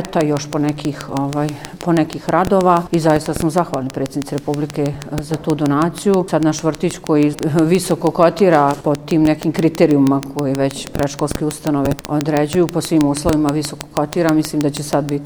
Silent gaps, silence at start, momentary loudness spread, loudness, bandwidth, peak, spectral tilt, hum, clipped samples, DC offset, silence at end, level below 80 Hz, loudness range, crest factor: none; 0 s; 8 LU; -17 LUFS; over 20 kHz; 0 dBFS; -6 dB/octave; none; under 0.1%; under 0.1%; 0 s; -42 dBFS; 4 LU; 16 dB